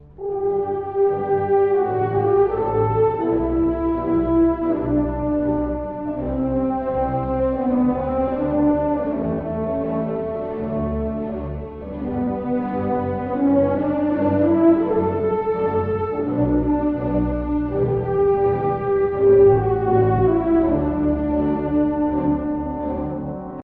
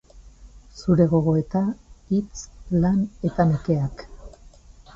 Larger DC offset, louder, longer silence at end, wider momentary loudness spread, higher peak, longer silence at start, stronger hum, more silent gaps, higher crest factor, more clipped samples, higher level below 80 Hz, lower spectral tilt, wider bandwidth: neither; first, -20 LUFS vs -23 LUFS; second, 0 s vs 0.45 s; second, 8 LU vs 16 LU; about the same, -4 dBFS vs -6 dBFS; about the same, 0.05 s vs 0.15 s; neither; neither; about the same, 16 dB vs 18 dB; neither; first, -36 dBFS vs -44 dBFS; first, -12.5 dB/octave vs -8.5 dB/octave; second, 4.2 kHz vs 7.6 kHz